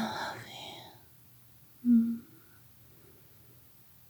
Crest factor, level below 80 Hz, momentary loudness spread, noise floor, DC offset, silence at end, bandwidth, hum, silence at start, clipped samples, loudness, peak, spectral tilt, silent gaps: 18 dB; -76 dBFS; 28 LU; -57 dBFS; under 0.1%; 1.85 s; over 20 kHz; none; 0 s; under 0.1%; -32 LUFS; -16 dBFS; -5.5 dB/octave; none